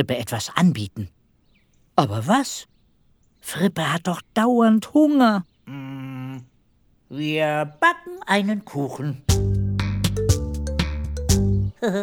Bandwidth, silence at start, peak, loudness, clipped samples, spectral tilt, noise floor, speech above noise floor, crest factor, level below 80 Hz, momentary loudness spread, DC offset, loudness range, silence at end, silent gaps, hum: 19 kHz; 0 s; 0 dBFS; -22 LUFS; under 0.1%; -5.5 dB/octave; -60 dBFS; 39 dB; 22 dB; -34 dBFS; 16 LU; under 0.1%; 4 LU; 0 s; none; none